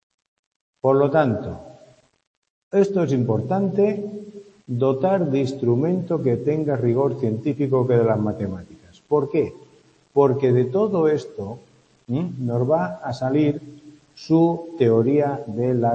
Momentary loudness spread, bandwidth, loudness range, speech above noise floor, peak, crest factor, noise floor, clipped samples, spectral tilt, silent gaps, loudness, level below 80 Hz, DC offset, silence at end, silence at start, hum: 12 LU; 8.2 kHz; 2 LU; 35 dB; -4 dBFS; 18 dB; -55 dBFS; under 0.1%; -9 dB/octave; 2.27-2.42 s, 2.50-2.71 s; -21 LUFS; -60 dBFS; under 0.1%; 0 s; 0.85 s; none